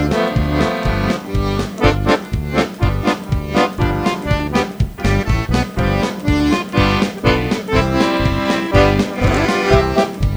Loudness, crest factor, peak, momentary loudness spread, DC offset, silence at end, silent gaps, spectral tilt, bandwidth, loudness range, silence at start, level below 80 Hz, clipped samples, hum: -17 LUFS; 16 dB; 0 dBFS; 5 LU; under 0.1%; 0 s; none; -6 dB/octave; over 20 kHz; 3 LU; 0 s; -24 dBFS; under 0.1%; none